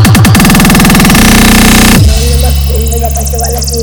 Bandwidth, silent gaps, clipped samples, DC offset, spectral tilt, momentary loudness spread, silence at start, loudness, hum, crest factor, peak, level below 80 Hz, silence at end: over 20 kHz; none; 9%; under 0.1%; -4.5 dB/octave; 8 LU; 0 s; -5 LUFS; none; 4 dB; 0 dBFS; -12 dBFS; 0 s